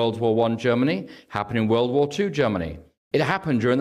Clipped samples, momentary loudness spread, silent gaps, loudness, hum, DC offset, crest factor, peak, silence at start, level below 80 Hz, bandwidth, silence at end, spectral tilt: under 0.1%; 9 LU; 2.98-3.11 s; -23 LUFS; none; under 0.1%; 14 dB; -8 dBFS; 0 s; -54 dBFS; 12.5 kHz; 0 s; -7 dB/octave